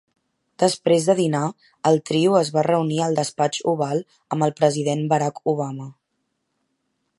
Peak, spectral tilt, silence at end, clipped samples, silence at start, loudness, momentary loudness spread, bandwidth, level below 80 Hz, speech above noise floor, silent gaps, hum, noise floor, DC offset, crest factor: -2 dBFS; -5.5 dB/octave; 1.25 s; under 0.1%; 0.6 s; -21 LUFS; 9 LU; 11.5 kHz; -70 dBFS; 54 dB; none; none; -74 dBFS; under 0.1%; 18 dB